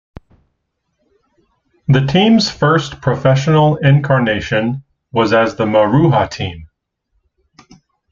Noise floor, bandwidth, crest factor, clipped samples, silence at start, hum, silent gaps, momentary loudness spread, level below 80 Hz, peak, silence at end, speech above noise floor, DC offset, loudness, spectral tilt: -70 dBFS; 7.4 kHz; 14 dB; under 0.1%; 1.9 s; none; none; 10 LU; -44 dBFS; 0 dBFS; 1.45 s; 57 dB; under 0.1%; -14 LUFS; -6.5 dB/octave